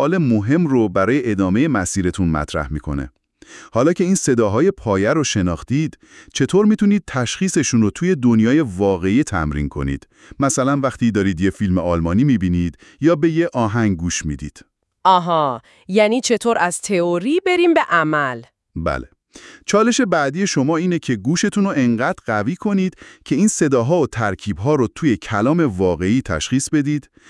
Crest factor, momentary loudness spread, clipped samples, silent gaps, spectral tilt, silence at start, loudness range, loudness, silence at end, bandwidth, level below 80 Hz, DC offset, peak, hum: 18 dB; 8 LU; under 0.1%; none; -5.5 dB/octave; 0 s; 2 LU; -18 LUFS; 0.3 s; 12 kHz; -42 dBFS; under 0.1%; 0 dBFS; none